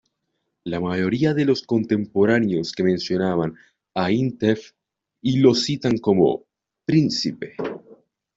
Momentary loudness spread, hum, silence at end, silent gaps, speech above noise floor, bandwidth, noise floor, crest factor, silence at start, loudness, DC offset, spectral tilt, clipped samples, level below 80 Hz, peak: 13 LU; none; 0.4 s; none; 56 dB; 8 kHz; -76 dBFS; 18 dB; 0.65 s; -21 LUFS; under 0.1%; -6.5 dB/octave; under 0.1%; -58 dBFS; -2 dBFS